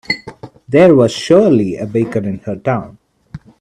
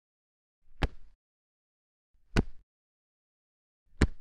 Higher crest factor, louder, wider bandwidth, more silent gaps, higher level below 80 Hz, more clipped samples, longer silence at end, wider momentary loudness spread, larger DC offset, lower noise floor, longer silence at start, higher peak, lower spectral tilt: second, 14 dB vs 28 dB; first, -13 LUFS vs -35 LUFS; about the same, 11 kHz vs 10.5 kHz; second, none vs 1.15-2.14 s, 2.63-3.86 s; second, -50 dBFS vs -40 dBFS; neither; first, 0.25 s vs 0 s; first, 12 LU vs 5 LU; neither; second, -35 dBFS vs under -90 dBFS; second, 0.1 s vs 0.7 s; first, 0 dBFS vs -8 dBFS; about the same, -6.5 dB/octave vs -6 dB/octave